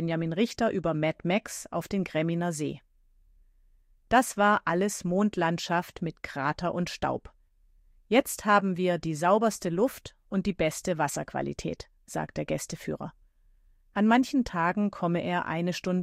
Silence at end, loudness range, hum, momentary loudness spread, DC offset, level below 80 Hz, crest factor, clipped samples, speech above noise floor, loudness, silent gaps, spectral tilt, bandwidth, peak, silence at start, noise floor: 0 s; 5 LU; none; 12 LU; under 0.1%; -56 dBFS; 20 dB; under 0.1%; 34 dB; -28 LUFS; none; -5.5 dB/octave; 16 kHz; -8 dBFS; 0 s; -62 dBFS